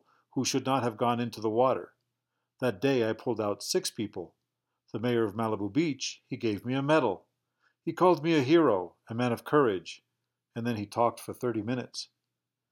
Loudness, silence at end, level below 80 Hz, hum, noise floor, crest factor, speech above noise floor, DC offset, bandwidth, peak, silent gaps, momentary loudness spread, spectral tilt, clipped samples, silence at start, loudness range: -29 LUFS; 0.65 s; -78 dBFS; none; -87 dBFS; 20 dB; 58 dB; under 0.1%; 17 kHz; -10 dBFS; none; 14 LU; -5 dB/octave; under 0.1%; 0.35 s; 4 LU